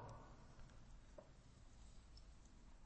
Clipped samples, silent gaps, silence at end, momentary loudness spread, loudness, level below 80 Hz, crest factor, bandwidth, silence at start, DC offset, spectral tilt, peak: under 0.1%; none; 0 s; 5 LU; -65 LUFS; -64 dBFS; 16 dB; 8.4 kHz; 0 s; under 0.1%; -5.5 dB/octave; -44 dBFS